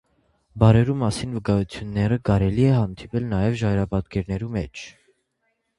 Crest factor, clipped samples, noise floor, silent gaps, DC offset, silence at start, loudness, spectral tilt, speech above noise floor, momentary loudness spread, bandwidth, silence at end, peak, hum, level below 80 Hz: 22 dB; under 0.1%; -73 dBFS; none; under 0.1%; 0.55 s; -22 LUFS; -7.5 dB/octave; 52 dB; 11 LU; 11.5 kHz; 0.9 s; -2 dBFS; none; -40 dBFS